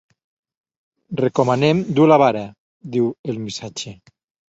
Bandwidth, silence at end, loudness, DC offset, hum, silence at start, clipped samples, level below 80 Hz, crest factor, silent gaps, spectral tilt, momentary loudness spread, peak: 8 kHz; 0.55 s; -18 LUFS; under 0.1%; none; 1.1 s; under 0.1%; -60 dBFS; 20 dB; 2.58-2.80 s, 3.19-3.24 s; -6.5 dB/octave; 17 LU; 0 dBFS